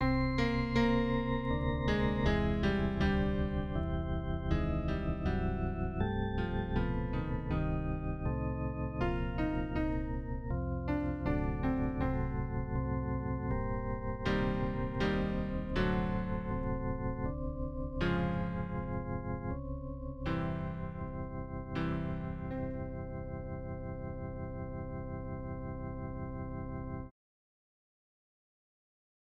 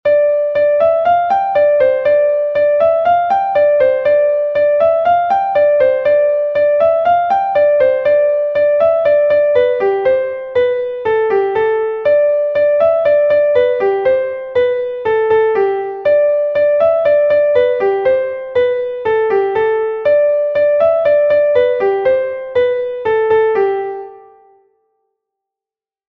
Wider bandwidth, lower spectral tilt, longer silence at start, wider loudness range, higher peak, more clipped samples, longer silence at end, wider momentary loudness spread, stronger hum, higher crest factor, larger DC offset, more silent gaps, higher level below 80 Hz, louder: first, 7.2 kHz vs 4.8 kHz; first, -8.5 dB/octave vs -6.5 dB/octave; about the same, 0 s vs 0.05 s; first, 9 LU vs 2 LU; second, -18 dBFS vs -2 dBFS; neither; first, 2.1 s vs 1.9 s; first, 10 LU vs 5 LU; neither; first, 18 dB vs 12 dB; first, 0.1% vs under 0.1%; neither; first, -40 dBFS vs -54 dBFS; second, -36 LUFS vs -13 LUFS